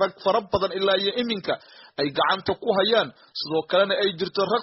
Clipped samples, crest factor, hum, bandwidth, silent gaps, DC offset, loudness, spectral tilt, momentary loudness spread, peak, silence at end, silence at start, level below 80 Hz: under 0.1%; 18 dB; none; 6 kHz; none; under 0.1%; -24 LUFS; -2 dB/octave; 9 LU; -6 dBFS; 0 s; 0 s; -58 dBFS